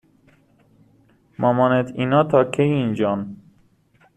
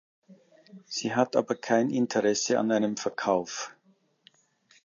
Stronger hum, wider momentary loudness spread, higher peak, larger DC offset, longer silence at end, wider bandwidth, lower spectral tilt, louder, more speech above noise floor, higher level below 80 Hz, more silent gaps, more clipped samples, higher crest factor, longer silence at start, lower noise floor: neither; second, 7 LU vs 11 LU; first, -2 dBFS vs -10 dBFS; neither; second, 0.8 s vs 1.15 s; first, 10 kHz vs 7.4 kHz; first, -8 dB/octave vs -4 dB/octave; first, -19 LUFS vs -27 LUFS; about the same, 39 dB vs 40 dB; first, -58 dBFS vs -76 dBFS; neither; neither; about the same, 20 dB vs 20 dB; first, 1.4 s vs 0.3 s; second, -58 dBFS vs -66 dBFS